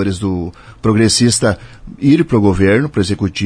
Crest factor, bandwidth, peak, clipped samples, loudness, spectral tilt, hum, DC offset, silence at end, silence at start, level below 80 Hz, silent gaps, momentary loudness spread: 14 dB; 10.5 kHz; 0 dBFS; under 0.1%; -14 LUFS; -5 dB/octave; none; under 0.1%; 0 s; 0 s; -36 dBFS; none; 9 LU